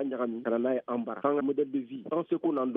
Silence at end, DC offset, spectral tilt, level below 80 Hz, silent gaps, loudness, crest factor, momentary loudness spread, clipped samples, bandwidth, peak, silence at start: 0 s; under 0.1%; -6.5 dB/octave; -80 dBFS; none; -31 LUFS; 18 dB; 5 LU; under 0.1%; 3.8 kHz; -12 dBFS; 0 s